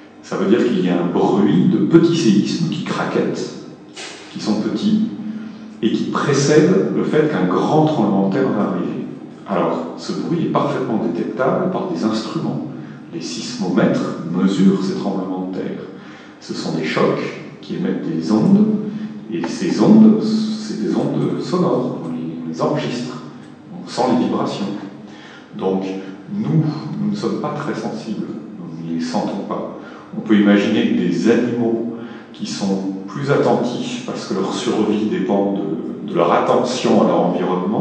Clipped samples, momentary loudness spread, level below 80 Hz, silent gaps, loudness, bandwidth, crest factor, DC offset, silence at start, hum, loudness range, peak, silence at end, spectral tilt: under 0.1%; 16 LU; -66 dBFS; none; -18 LUFS; 9.2 kHz; 18 dB; under 0.1%; 0 s; none; 6 LU; 0 dBFS; 0 s; -6.5 dB/octave